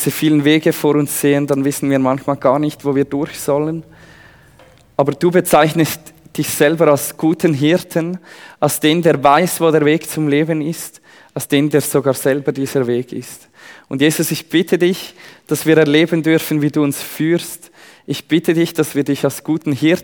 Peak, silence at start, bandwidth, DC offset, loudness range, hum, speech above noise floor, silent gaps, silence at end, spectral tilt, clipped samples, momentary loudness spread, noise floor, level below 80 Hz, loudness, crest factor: 0 dBFS; 0 s; over 20 kHz; under 0.1%; 4 LU; none; 31 dB; none; 0 s; -5 dB/octave; under 0.1%; 13 LU; -46 dBFS; -58 dBFS; -15 LUFS; 16 dB